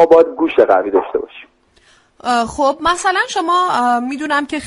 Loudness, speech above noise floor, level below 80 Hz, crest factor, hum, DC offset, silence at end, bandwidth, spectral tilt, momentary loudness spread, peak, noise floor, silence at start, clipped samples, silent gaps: -15 LUFS; 37 dB; -48 dBFS; 14 dB; none; under 0.1%; 0 s; 11.5 kHz; -3.5 dB/octave; 8 LU; 0 dBFS; -52 dBFS; 0 s; under 0.1%; none